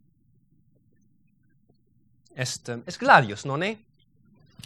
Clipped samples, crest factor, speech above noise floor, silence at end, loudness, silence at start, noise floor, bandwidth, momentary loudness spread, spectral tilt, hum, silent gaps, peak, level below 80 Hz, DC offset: under 0.1%; 26 dB; 42 dB; 0.9 s; -23 LUFS; 2.35 s; -65 dBFS; 13.5 kHz; 19 LU; -4 dB/octave; none; none; -2 dBFS; -70 dBFS; under 0.1%